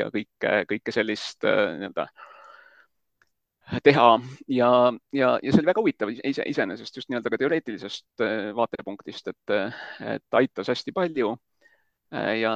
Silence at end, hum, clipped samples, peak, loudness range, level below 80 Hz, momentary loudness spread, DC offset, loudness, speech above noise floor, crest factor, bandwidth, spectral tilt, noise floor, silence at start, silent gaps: 0 s; none; under 0.1%; -2 dBFS; 7 LU; -64 dBFS; 16 LU; under 0.1%; -24 LUFS; 46 dB; 24 dB; 9 kHz; -6 dB/octave; -70 dBFS; 0 s; none